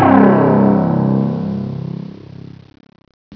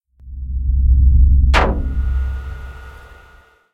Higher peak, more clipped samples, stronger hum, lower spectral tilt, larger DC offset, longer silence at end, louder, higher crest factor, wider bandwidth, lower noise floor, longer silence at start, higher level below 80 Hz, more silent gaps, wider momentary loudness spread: about the same, 0 dBFS vs 0 dBFS; neither; neither; first, -11 dB/octave vs -7 dB/octave; neither; second, 0 s vs 0.75 s; about the same, -14 LUFS vs -16 LUFS; about the same, 14 dB vs 16 dB; second, 5.4 kHz vs 7.2 kHz; second, -35 dBFS vs -48 dBFS; second, 0 s vs 0.25 s; second, -50 dBFS vs -16 dBFS; first, 3.14-3.31 s vs none; first, 24 LU vs 21 LU